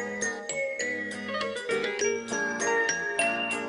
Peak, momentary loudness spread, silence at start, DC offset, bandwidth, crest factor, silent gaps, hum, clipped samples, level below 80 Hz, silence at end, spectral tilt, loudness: -12 dBFS; 6 LU; 0 s; under 0.1%; 11 kHz; 16 dB; none; none; under 0.1%; -68 dBFS; 0 s; -1.5 dB/octave; -28 LUFS